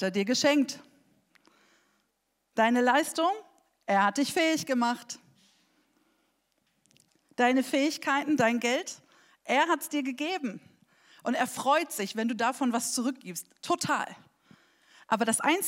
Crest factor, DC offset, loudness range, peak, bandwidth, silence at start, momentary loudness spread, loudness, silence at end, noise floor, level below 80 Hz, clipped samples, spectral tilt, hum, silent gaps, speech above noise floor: 20 dB; under 0.1%; 4 LU; -10 dBFS; 16 kHz; 0 s; 14 LU; -28 LUFS; 0 s; -78 dBFS; -84 dBFS; under 0.1%; -3 dB/octave; none; none; 50 dB